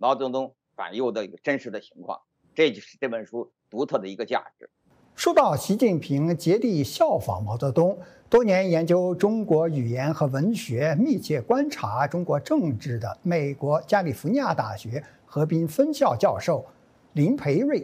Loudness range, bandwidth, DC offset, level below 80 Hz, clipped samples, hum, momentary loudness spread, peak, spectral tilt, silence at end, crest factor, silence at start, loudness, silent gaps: 6 LU; 16 kHz; under 0.1%; -62 dBFS; under 0.1%; none; 12 LU; -8 dBFS; -6.5 dB/octave; 0 s; 16 dB; 0 s; -24 LUFS; none